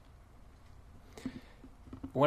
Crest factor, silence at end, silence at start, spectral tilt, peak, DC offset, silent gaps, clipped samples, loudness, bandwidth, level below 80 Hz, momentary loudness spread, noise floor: 24 dB; 0 s; 1.15 s; -7.5 dB/octave; -14 dBFS; under 0.1%; none; under 0.1%; -49 LUFS; 15 kHz; -58 dBFS; 14 LU; -56 dBFS